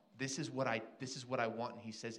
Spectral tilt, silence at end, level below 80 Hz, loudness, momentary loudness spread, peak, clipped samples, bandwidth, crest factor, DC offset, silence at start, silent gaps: -4 dB/octave; 0 s; -84 dBFS; -41 LUFS; 8 LU; -22 dBFS; under 0.1%; 12 kHz; 20 dB; under 0.1%; 0.15 s; none